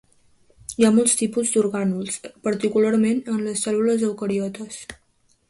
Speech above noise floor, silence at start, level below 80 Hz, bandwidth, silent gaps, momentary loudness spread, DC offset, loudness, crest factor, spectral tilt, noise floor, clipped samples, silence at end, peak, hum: 36 dB; 0.7 s; -60 dBFS; 11.5 kHz; none; 16 LU; under 0.1%; -21 LUFS; 18 dB; -4.5 dB/octave; -57 dBFS; under 0.1%; 0.55 s; -4 dBFS; none